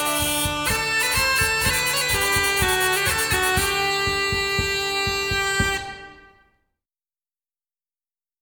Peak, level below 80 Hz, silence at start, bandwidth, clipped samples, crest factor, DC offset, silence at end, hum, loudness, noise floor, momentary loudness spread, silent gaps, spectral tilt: -6 dBFS; -40 dBFS; 0 s; over 20 kHz; under 0.1%; 16 dB; under 0.1%; 2.25 s; none; -20 LUFS; under -90 dBFS; 3 LU; none; -2 dB/octave